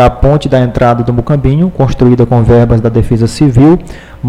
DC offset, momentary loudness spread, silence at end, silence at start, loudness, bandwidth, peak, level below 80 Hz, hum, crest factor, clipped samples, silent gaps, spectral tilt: under 0.1%; 4 LU; 0 s; 0 s; -9 LUFS; 11 kHz; 0 dBFS; -20 dBFS; none; 8 dB; under 0.1%; none; -8.5 dB/octave